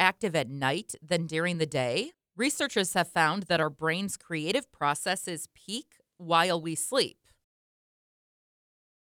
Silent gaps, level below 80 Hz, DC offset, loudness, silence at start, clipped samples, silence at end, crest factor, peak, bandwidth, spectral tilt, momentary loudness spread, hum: none; -72 dBFS; under 0.1%; -29 LUFS; 0 s; under 0.1%; 1.95 s; 24 dB; -6 dBFS; 19.5 kHz; -3.5 dB/octave; 11 LU; none